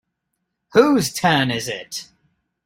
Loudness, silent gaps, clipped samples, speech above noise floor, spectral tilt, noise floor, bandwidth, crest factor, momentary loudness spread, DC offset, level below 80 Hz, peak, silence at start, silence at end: -18 LUFS; none; under 0.1%; 58 dB; -4.5 dB/octave; -76 dBFS; 16.5 kHz; 20 dB; 15 LU; under 0.1%; -56 dBFS; -2 dBFS; 0.75 s; 0.65 s